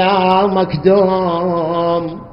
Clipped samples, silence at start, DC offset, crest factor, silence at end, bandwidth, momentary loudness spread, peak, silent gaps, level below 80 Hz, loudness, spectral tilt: under 0.1%; 0 s; under 0.1%; 14 dB; 0 s; 5.6 kHz; 5 LU; 0 dBFS; none; -46 dBFS; -14 LUFS; -9.5 dB/octave